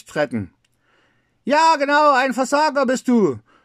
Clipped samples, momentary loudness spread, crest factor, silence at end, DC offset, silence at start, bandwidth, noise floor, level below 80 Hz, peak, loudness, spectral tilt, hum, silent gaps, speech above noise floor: under 0.1%; 12 LU; 16 dB; 0.25 s; under 0.1%; 0.1 s; 14.5 kHz; -62 dBFS; -68 dBFS; -4 dBFS; -17 LUFS; -4.5 dB/octave; none; none; 45 dB